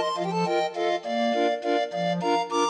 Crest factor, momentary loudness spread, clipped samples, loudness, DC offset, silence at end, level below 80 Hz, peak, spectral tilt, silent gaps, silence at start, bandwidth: 12 dB; 2 LU; under 0.1%; -26 LUFS; under 0.1%; 0 s; -80 dBFS; -12 dBFS; -5 dB/octave; none; 0 s; 11 kHz